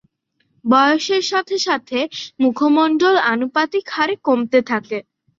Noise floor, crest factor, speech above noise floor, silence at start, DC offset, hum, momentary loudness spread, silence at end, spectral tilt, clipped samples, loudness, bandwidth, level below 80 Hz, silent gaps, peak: -67 dBFS; 16 dB; 50 dB; 0.65 s; under 0.1%; none; 8 LU; 0.35 s; -3.5 dB/octave; under 0.1%; -17 LUFS; 7.6 kHz; -66 dBFS; none; -2 dBFS